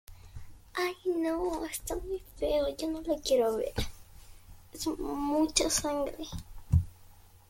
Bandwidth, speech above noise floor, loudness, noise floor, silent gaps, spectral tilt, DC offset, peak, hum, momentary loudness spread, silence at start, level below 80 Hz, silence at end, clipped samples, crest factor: 16.5 kHz; 24 dB; -32 LUFS; -55 dBFS; none; -4.5 dB/octave; under 0.1%; -10 dBFS; none; 17 LU; 0.1 s; -46 dBFS; 0.3 s; under 0.1%; 24 dB